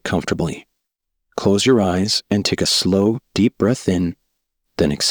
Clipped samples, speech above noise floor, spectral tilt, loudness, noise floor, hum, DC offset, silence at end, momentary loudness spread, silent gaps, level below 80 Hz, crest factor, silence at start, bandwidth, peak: under 0.1%; 60 dB; -4.5 dB/octave; -18 LUFS; -77 dBFS; none; under 0.1%; 0 s; 10 LU; none; -46 dBFS; 16 dB; 0.05 s; over 20 kHz; -2 dBFS